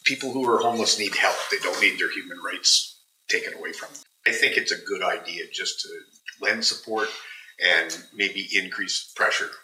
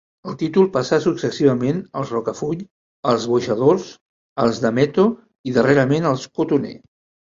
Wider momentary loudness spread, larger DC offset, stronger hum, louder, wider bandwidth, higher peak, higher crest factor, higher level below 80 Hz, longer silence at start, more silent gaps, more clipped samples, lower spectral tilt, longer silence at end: first, 14 LU vs 10 LU; neither; neither; second, -23 LUFS vs -19 LUFS; first, 16 kHz vs 7.6 kHz; about the same, -4 dBFS vs -2 dBFS; about the same, 20 dB vs 18 dB; second, -90 dBFS vs -58 dBFS; second, 0.05 s vs 0.25 s; second, none vs 2.71-3.03 s, 4.01-4.36 s, 5.39-5.44 s; neither; second, -0.5 dB/octave vs -6.5 dB/octave; second, 0.05 s vs 0.6 s